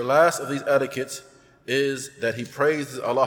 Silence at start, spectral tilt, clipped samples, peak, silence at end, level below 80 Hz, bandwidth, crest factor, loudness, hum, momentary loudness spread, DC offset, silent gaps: 0 s; -4 dB/octave; under 0.1%; -6 dBFS; 0 s; -68 dBFS; 18.5 kHz; 18 dB; -24 LUFS; none; 12 LU; under 0.1%; none